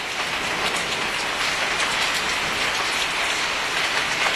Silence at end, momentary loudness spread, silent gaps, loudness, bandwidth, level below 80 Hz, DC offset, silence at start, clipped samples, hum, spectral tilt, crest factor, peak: 0 s; 3 LU; none; -21 LUFS; 14 kHz; -50 dBFS; under 0.1%; 0 s; under 0.1%; none; -0.5 dB/octave; 16 dB; -6 dBFS